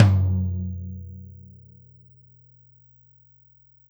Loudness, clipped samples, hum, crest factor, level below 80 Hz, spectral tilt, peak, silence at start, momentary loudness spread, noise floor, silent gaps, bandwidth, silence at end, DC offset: -25 LUFS; under 0.1%; none; 26 dB; -50 dBFS; -8.5 dB/octave; 0 dBFS; 0 s; 27 LU; -57 dBFS; none; over 20 kHz; 2.6 s; under 0.1%